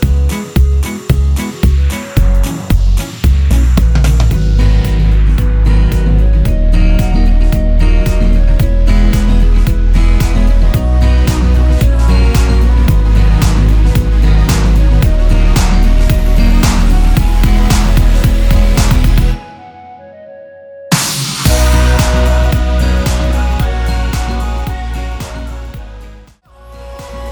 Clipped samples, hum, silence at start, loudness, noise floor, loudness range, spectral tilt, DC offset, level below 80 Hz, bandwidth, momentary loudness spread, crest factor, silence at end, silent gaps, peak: under 0.1%; none; 0 s; -12 LUFS; -38 dBFS; 4 LU; -6 dB/octave; under 0.1%; -10 dBFS; over 20 kHz; 6 LU; 8 dB; 0 s; none; 0 dBFS